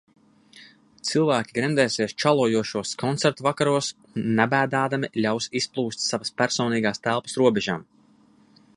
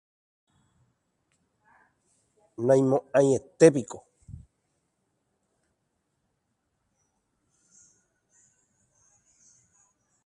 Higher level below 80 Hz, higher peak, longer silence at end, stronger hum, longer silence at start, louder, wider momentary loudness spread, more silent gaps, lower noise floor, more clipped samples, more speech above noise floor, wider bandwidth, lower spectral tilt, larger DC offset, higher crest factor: about the same, -64 dBFS vs -66 dBFS; about the same, -2 dBFS vs -4 dBFS; second, 0.95 s vs 6.3 s; neither; second, 0.55 s vs 2.6 s; about the same, -24 LUFS vs -23 LUFS; second, 6 LU vs 23 LU; neither; second, -57 dBFS vs -78 dBFS; neither; second, 34 dB vs 56 dB; about the same, 11.5 kHz vs 11 kHz; second, -4.5 dB/octave vs -6.5 dB/octave; neither; about the same, 22 dB vs 26 dB